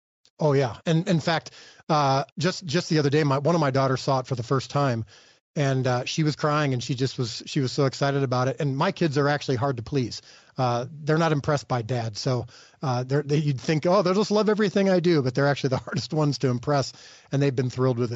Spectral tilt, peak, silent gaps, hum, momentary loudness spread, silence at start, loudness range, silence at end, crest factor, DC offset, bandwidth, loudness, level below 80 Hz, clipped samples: -5.5 dB/octave; -10 dBFS; 1.83-1.87 s, 2.32-2.36 s, 5.41-5.54 s; none; 7 LU; 0.4 s; 3 LU; 0 s; 14 dB; under 0.1%; 8 kHz; -24 LUFS; -60 dBFS; under 0.1%